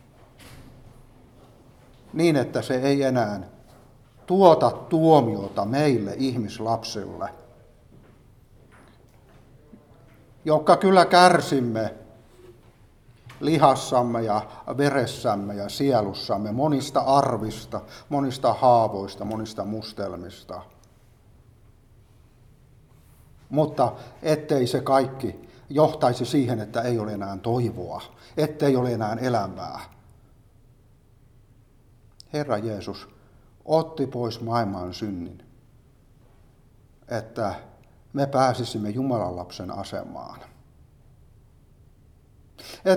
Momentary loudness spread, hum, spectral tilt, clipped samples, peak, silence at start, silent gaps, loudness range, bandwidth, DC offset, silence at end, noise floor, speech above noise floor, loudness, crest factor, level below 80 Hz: 17 LU; none; -6 dB/octave; under 0.1%; -2 dBFS; 0.45 s; none; 14 LU; 16.5 kHz; under 0.1%; 0 s; -55 dBFS; 32 dB; -24 LUFS; 24 dB; -56 dBFS